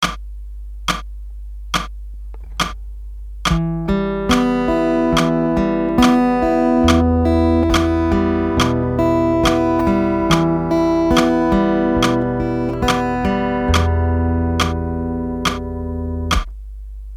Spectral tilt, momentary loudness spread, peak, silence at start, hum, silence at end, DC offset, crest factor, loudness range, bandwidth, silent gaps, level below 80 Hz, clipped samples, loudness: -6 dB/octave; 19 LU; 0 dBFS; 0 s; none; 0 s; under 0.1%; 16 dB; 6 LU; 16 kHz; none; -28 dBFS; under 0.1%; -17 LUFS